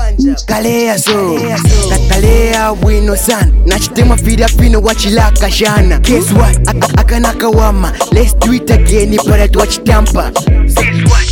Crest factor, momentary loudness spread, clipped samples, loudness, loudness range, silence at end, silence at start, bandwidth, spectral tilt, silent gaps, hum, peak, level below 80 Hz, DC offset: 8 dB; 3 LU; 0.2%; -10 LUFS; 1 LU; 0 s; 0 s; 17 kHz; -5 dB/octave; none; none; 0 dBFS; -10 dBFS; under 0.1%